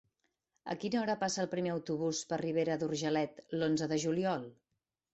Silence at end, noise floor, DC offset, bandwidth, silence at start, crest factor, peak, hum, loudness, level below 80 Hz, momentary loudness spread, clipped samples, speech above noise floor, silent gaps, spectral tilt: 0.6 s; -82 dBFS; under 0.1%; 8.2 kHz; 0.65 s; 16 dB; -20 dBFS; none; -35 LUFS; -74 dBFS; 7 LU; under 0.1%; 48 dB; none; -5 dB/octave